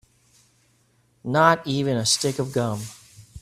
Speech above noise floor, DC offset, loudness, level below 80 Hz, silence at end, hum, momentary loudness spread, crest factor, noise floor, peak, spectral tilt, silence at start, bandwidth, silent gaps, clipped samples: 41 dB; under 0.1%; -22 LUFS; -56 dBFS; 0 s; none; 15 LU; 22 dB; -63 dBFS; -2 dBFS; -4 dB/octave; 1.25 s; 15 kHz; none; under 0.1%